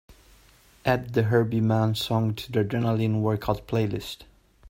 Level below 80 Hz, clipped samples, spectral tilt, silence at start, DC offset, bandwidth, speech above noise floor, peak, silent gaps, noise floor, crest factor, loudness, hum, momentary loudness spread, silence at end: -52 dBFS; under 0.1%; -7 dB/octave; 0.1 s; under 0.1%; 16 kHz; 32 dB; -6 dBFS; none; -56 dBFS; 20 dB; -25 LUFS; none; 7 LU; 0.45 s